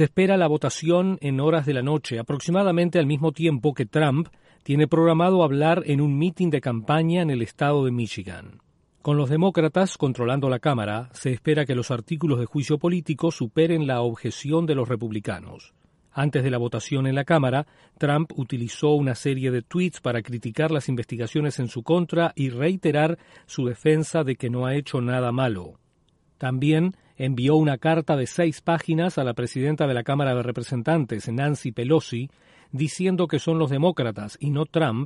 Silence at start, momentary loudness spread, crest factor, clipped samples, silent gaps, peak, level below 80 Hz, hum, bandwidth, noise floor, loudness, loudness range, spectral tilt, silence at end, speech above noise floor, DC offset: 0 s; 8 LU; 16 dB; under 0.1%; none; -6 dBFS; -60 dBFS; none; 11.5 kHz; -64 dBFS; -23 LUFS; 4 LU; -7 dB/octave; 0 s; 41 dB; under 0.1%